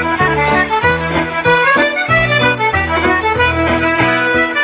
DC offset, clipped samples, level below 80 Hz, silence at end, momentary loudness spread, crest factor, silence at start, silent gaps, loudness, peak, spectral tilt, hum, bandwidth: under 0.1%; under 0.1%; -30 dBFS; 0 s; 3 LU; 12 dB; 0 s; none; -12 LUFS; 0 dBFS; -8.5 dB/octave; none; 4 kHz